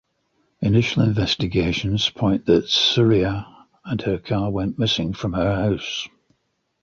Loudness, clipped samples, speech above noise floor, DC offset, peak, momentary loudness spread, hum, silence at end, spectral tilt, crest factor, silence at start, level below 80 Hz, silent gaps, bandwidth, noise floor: -21 LUFS; under 0.1%; 51 dB; under 0.1%; -4 dBFS; 10 LU; none; 0.75 s; -6 dB/octave; 18 dB; 0.6 s; -42 dBFS; none; 7.4 kHz; -71 dBFS